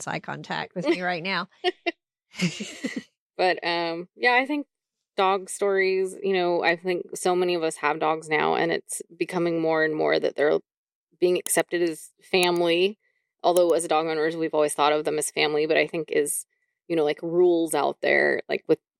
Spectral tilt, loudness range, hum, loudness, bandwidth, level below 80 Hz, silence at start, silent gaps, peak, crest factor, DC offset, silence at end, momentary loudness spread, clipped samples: -3.5 dB/octave; 3 LU; none; -24 LUFS; 15.5 kHz; -76 dBFS; 0 s; 3.17-3.30 s, 10.77-10.87 s, 10.95-11.07 s; -6 dBFS; 18 dB; under 0.1%; 0.25 s; 10 LU; under 0.1%